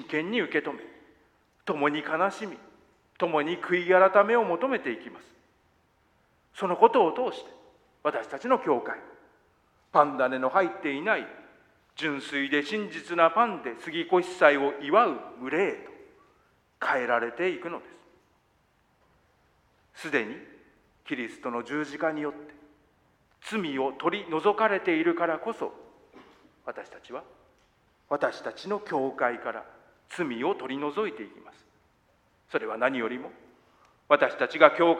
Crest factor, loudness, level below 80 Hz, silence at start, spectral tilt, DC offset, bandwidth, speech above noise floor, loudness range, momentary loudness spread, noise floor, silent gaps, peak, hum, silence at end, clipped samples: 28 dB; -27 LUFS; -74 dBFS; 0 s; -5.5 dB/octave; under 0.1%; 11 kHz; 41 dB; 10 LU; 19 LU; -68 dBFS; none; 0 dBFS; none; 0 s; under 0.1%